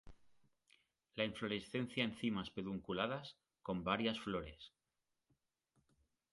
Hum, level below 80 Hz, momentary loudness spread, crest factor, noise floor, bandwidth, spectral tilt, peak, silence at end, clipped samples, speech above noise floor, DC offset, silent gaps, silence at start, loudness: none; -68 dBFS; 15 LU; 24 dB; -89 dBFS; 11.5 kHz; -6 dB/octave; -20 dBFS; 1.65 s; under 0.1%; 47 dB; under 0.1%; none; 0.05 s; -42 LUFS